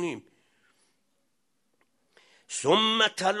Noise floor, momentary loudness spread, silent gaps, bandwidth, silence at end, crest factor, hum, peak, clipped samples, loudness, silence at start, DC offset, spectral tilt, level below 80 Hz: -77 dBFS; 15 LU; none; 12 kHz; 0 s; 22 dB; none; -8 dBFS; under 0.1%; -24 LUFS; 0 s; under 0.1%; -2.5 dB/octave; -78 dBFS